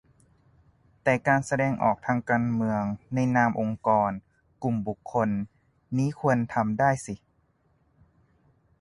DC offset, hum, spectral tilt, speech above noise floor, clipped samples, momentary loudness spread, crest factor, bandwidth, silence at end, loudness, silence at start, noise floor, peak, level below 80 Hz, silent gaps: under 0.1%; none; -7.5 dB/octave; 42 dB; under 0.1%; 9 LU; 18 dB; 11.5 kHz; 1.65 s; -26 LUFS; 1.05 s; -67 dBFS; -10 dBFS; -58 dBFS; none